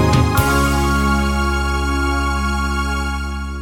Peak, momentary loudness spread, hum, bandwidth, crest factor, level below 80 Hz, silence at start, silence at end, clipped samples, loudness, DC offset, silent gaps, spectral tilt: -2 dBFS; 7 LU; none; 18 kHz; 14 dB; -22 dBFS; 0 s; 0 s; under 0.1%; -18 LUFS; under 0.1%; none; -5.5 dB/octave